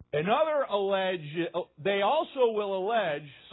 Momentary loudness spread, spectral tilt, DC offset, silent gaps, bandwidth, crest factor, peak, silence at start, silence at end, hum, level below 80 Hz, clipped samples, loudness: 7 LU; -9.5 dB/octave; under 0.1%; none; 4.1 kHz; 16 dB; -12 dBFS; 0 s; 0 s; none; -70 dBFS; under 0.1%; -28 LUFS